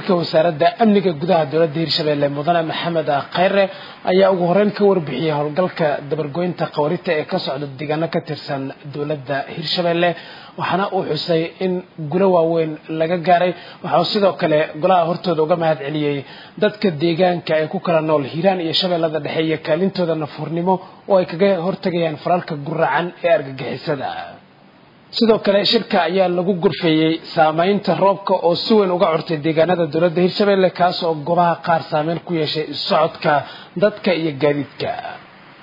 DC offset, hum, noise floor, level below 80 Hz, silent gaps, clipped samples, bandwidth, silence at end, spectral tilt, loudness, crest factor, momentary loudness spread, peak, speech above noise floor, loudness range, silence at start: under 0.1%; none; -48 dBFS; -62 dBFS; none; under 0.1%; 5.4 kHz; 0.4 s; -7.5 dB/octave; -18 LUFS; 16 dB; 9 LU; -2 dBFS; 30 dB; 5 LU; 0 s